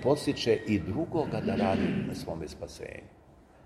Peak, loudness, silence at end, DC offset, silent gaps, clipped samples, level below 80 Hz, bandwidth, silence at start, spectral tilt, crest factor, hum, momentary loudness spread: -12 dBFS; -30 LUFS; 0.55 s; under 0.1%; none; under 0.1%; -54 dBFS; 13.5 kHz; 0 s; -6.5 dB/octave; 18 dB; none; 14 LU